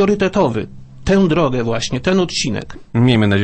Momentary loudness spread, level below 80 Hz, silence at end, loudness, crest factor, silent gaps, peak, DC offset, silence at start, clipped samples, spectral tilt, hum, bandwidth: 12 LU; -38 dBFS; 0 s; -16 LUFS; 14 dB; none; -2 dBFS; under 0.1%; 0 s; under 0.1%; -6 dB/octave; none; 8.8 kHz